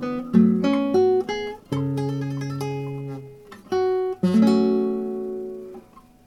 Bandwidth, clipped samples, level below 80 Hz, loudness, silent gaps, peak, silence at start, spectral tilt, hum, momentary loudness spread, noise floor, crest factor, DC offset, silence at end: 12 kHz; under 0.1%; -58 dBFS; -22 LUFS; none; -4 dBFS; 0 s; -8 dB/octave; none; 16 LU; -47 dBFS; 18 dB; under 0.1%; 0.25 s